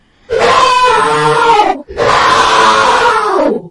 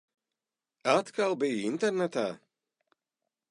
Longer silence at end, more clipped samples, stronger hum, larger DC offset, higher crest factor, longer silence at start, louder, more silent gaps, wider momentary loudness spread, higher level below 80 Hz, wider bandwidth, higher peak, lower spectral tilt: second, 0 s vs 1.15 s; first, 0.2% vs under 0.1%; neither; neither; second, 10 dB vs 22 dB; second, 0.3 s vs 0.85 s; first, -9 LUFS vs -30 LUFS; neither; about the same, 6 LU vs 8 LU; first, -38 dBFS vs -82 dBFS; about the same, 11.5 kHz vs 11.5 kHz; first, 0 dBFS vs -10 dBFS; second, -3 dB/octave vs -4.5 dB/octave